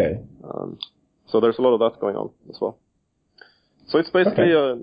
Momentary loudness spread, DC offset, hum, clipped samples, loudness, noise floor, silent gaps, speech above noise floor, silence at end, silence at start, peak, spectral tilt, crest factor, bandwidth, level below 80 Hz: 17 LU; under 0.1%; none; under 0.1%; -21 LUFS; -70 dBFS; none; 50 dB; 0 s; 0 s; -4 dBFS; -9.5 dB/octave; 18 dB; 5.2 kHz; -54 dBFS